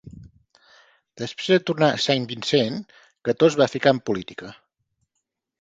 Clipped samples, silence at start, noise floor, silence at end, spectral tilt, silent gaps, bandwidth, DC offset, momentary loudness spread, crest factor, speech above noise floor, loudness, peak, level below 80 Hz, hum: under 0.1%; 0.05 s; -79 dBFS; 1.1 s; -5 dB/octave; none; 9.2 kHz; under 0.1%; 16 LU; 22 dB; 58 dB; -21 LUFS; -2 dBFS; -60 dBFS; none